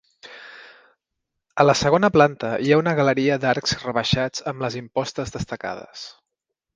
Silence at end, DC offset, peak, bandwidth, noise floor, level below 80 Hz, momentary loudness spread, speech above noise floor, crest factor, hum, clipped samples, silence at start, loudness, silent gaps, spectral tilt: 0.65 s; under 0.1%; 0 dBFS; 9.8 kHz; -82 dBFS; -50 dBFS; 20 LU; 62 dB; 22 dB; none; under 0.1%; 0.25 s; -21 LUFS; none; -5 dB/octave